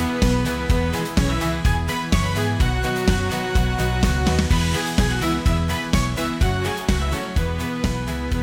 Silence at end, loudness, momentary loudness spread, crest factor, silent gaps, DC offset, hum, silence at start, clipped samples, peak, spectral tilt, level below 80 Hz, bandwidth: 0 s; -21 LUFS; 4 LU; 12 dB; none; under 0.1%; none; 0 s; under 0.1%; -8 dBFS; -5 dB/octave; -24 dBFS; 18 kHz